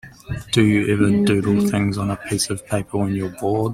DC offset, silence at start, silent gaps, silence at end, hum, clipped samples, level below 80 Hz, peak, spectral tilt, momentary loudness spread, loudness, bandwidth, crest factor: under 0.1%; 0.05 s; none; 0 s; none; under 0.1%; -46 dBFS; -2 dBFS; -5.5 dB/octave; 8 LU; -20 LUFS; 15 kHz; 16 dB